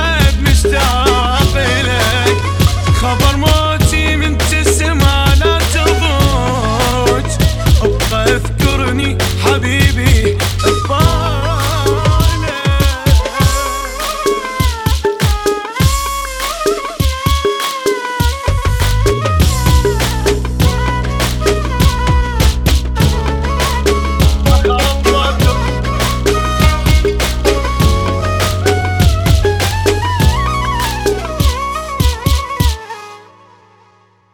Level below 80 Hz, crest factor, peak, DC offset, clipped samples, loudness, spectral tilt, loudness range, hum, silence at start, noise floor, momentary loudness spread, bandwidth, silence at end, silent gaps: -16 dBFS; 12 dB; 0 dBFS; under 0.1%; under 0.1%; -13 LUFS; -4.5 dB/octave; 3 LU; none; 0 s; -50 dBFS; 5 LU; over 20 kHz; 1.15 s; none